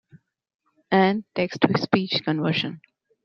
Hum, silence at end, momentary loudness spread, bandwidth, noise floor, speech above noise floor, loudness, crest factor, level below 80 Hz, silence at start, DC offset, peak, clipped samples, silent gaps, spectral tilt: none; 0.45 s; 6 LU; 6.6 kHz; -56 dBFS; 33 dB; -23 LUFS; 22 dB; -66 dBFS; 0.9 s; under 0.1%; -2 dBFS; under 0.1%; none; -7 dB/octave